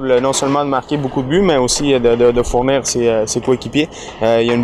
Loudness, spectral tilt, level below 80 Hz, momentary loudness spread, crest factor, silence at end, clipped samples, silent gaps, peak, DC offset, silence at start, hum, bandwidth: -15 LUFS; -4.5 dB/octave; -34 dBFS; 6 LU; 12 dB; 0 s; under 0.1%; none; -2 dBFS; under 0.1%; 0 s; none; 14.5 kHz